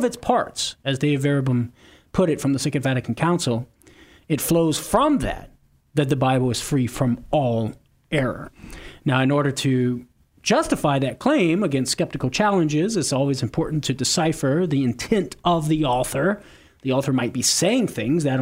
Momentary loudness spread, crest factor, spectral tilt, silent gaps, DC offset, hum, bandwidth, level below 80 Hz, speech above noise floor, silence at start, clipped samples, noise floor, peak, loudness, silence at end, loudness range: 8 LU; 18 dB; -5 dB/octave; none; under 0.1%; none; 16 kHz; -46 dBFS; 29 dB; 0 s; under 0.1%; -50 dBFS; -4 dBFS; -22 LUFS; 0 s; 2 LU